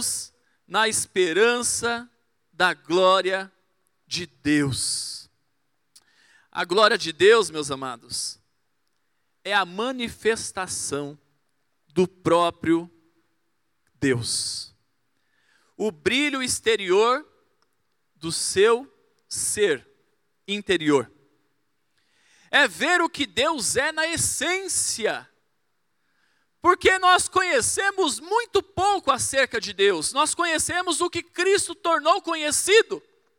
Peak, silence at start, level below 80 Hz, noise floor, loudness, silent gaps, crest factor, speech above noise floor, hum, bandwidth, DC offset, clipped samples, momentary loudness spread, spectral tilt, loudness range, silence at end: -4 dBFS; 0 s; -60 dBFS; -76 dBFS; -22 LUFS; none; 20 dB; 53 dB; none; 18 kHz; under 0.1%; under 0.1%; 12 LU; -2.5 dB/octave; 6 LU; 0.4 s